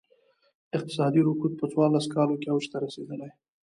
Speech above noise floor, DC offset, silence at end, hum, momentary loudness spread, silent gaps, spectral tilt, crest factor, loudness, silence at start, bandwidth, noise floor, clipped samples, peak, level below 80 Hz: 39 dB; under 0.1%; 0.35 s; none; 14 LU; none; -7 dB/octave; 16 dB; -27 LUFS; 0.75 s; 11 kHz; -65 dBFS; under 0.1%; -10 dBFS; -74 dBFS